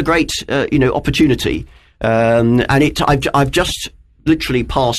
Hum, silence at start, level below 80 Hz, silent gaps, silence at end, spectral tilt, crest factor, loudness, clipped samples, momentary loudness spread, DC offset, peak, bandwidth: none; 0 s; -32 dBFS; none; 0 s; -5.5 dB/octave; 14 dB; -15 LUFS; under 0.1%; 8 LU; under 0.1%; 0 dBFS; 13.5 kHz